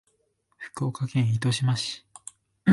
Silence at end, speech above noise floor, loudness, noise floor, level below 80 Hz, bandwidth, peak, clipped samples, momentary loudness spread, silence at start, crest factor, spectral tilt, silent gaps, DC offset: 0 s; 45 dB; -27 LUFS; -71 dBFS; -62 dBFS; 11.5 kHz; -8 dBFS; under 0.1%; 19 LU; 0.6 s; 20 dB; -5.5 dB/octave; none; under 0.1%